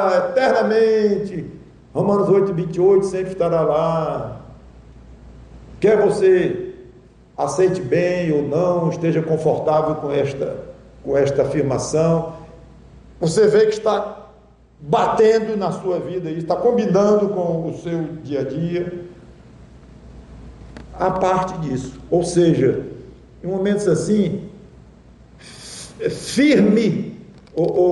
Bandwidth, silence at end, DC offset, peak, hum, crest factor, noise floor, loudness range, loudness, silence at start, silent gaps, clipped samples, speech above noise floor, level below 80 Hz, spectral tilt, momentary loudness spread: 11.5 kHz; 0 s; under 0.1%; -6 dBFS; none; 14 dB; -49 dBFS; 5 LU; -19 LUFS; 0 s; none; under 0.1%; 31 dB; -48 dBFS; -6.5 dB/octave; 17 LU